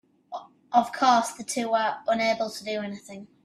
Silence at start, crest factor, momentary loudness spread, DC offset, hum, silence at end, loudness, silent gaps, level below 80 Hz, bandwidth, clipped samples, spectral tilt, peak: 0.3 s; 20 dB; 19 LU; under 0.1%; none; 0.2 s; -25 LUFS; none; -72 dBFS; 13.5 kHz; under 0.1%; -3 dB/octave; -6 dBFS